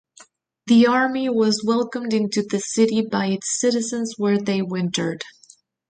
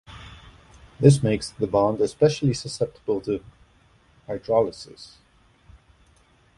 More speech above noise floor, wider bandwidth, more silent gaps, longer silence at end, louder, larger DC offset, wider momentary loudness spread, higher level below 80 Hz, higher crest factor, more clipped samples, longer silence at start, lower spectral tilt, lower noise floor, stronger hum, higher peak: about the same, 33 dB vs 36 dB; second, 9.6 kHz vs 11.5 kHz; neither; second, 0.6 s vs 1.5 s; about the same, -21 LUFS vs -23 LUFS; neither; second, 8 LU vs 24 LU; second, -66 dBFS vs -52 dBFS; second, 16 dB vs 24 dB; neither; first, 0.65 s vs 0.1 s; second, -4.5 dB/octave vs -6.5 dB/octave; second, -53 dBFS vs -58 dBFS; neither; second, -6 dBFS vs -2 dBFS